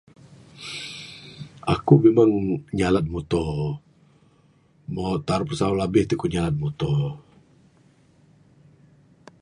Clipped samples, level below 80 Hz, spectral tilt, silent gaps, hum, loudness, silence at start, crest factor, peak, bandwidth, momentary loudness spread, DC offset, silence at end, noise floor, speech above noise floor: under 0.1%; -46 dBFS; -7.5 dB/octave; none; none; -23 LUFS; 0.55 s; 24 dB; -2 dBFS; 11.5 kHz; 21 LU; under 0.1%; 2.2 s; -59 dBFS; 37 dB